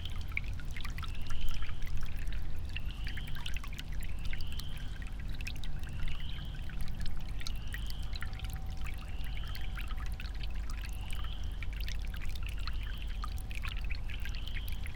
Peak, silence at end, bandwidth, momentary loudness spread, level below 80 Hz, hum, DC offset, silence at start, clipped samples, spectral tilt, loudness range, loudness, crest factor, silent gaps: -16 dBFS; 0 s; 17.5 kHz; 2 LU; -38 dBFS; none; under 0.1%; 0 s; under 0.1%; -4.5 dB/octave; 1 LU; -42 LUFS; 18 dB; none